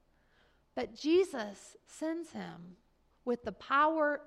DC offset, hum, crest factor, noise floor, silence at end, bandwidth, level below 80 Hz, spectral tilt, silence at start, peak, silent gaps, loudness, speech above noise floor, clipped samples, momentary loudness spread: under 0.1%; none; 16 dB; -69 dBFS; 0.05 s; 12.5 kHz; -70 dBFS; -4.5 dB/octave; 0.75 s; -18 dBFS; none; -33 LUFS; 35 dB; under 0.1%; 18 LU